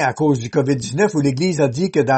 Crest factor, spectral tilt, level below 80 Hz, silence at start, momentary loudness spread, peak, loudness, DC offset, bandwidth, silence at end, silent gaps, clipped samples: 14 dB; -6 dB/octave; -52 dBFS; 0 s; 2 LU; -4 dBFS; -18 LUFS; under 0.1%; 8.8 kHz; 0 s; none; under 0.1%